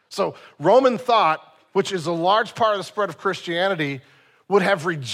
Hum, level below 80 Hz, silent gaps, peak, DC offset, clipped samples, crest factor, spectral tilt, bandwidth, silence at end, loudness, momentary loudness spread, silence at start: none; -72 dBFS; none; -4 dBFS; under 0.1%; under 0.1%; 16 dB; -5 dB/octave; 14.5 kHz; 0 s; -21 LUFS; 9 LU; 0.1 s